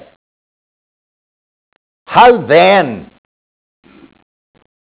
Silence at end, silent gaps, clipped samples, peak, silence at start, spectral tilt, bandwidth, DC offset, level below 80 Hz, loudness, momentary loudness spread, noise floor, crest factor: 1.8 s; none; under 0.1%; 0 dBFS; 2.1 s; -8.5 dB/octave; 4 kHz; under 0.1%; -52 dBFS; -9 LUFS; 13 LU; under -90 dBFS; 16 dB